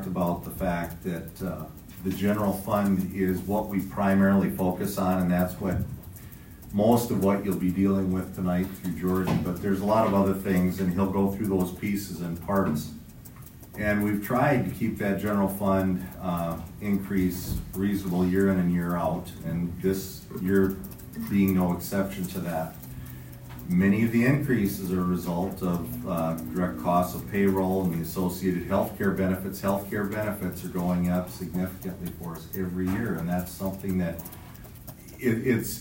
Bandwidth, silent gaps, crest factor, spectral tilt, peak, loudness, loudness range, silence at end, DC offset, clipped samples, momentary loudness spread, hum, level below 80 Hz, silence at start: 16.5 kHz; none; 18 dB; -7 dB/octave; -8 dBFS; -27 LUFS; 4 LU; 0 s; under 0.1%; under 0.1%; 13 LU; none; -48 dBFS; 0 s